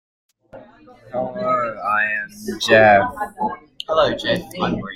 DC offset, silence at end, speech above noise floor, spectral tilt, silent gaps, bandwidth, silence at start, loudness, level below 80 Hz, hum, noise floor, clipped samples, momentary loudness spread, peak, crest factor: under 0.1%; 0 s; 25 dB; -4.5 dB/octave; none; 16 kHz; 0.55 s; -19 LUFS; -50 dBFS; none; -44 dBFS; under 0.1%; 14 LU; -2 dBFS; 18 dB